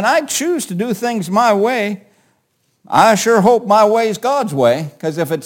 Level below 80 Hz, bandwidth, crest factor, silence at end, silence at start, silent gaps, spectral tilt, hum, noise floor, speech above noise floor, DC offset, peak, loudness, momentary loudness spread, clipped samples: -62 dBFS; 17 kHz; 14 dB; 0 s; 0 s; none; -4.5 dB/octave; none; -64 dBFS; 49 dB; under 0.1%; 0 dBFS; -14 LUFS; 9 LU; under 0.1%